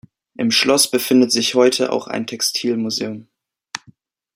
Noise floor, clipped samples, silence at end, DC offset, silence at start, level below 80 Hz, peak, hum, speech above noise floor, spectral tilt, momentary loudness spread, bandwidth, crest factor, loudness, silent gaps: -53 dBFS; under 0.1%; 0.6 s; under 0.1%; 0.4 s; -64 dBFS; -2 dBFS; none; 35 dB; -2.5 dB/octave; 18 LU; 16.5 kHz; 18 dB; -17 LUFS; none